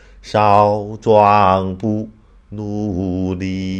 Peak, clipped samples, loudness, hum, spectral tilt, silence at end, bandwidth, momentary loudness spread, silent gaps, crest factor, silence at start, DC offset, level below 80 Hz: 0 dBFS; under 0.1%; -16 LUFS; none; -7.5 dB/octave; 0 s; 9.2 kHz; 14 LU; none; 16 dB; 0.25 s; under 0.1%; -44 dBFS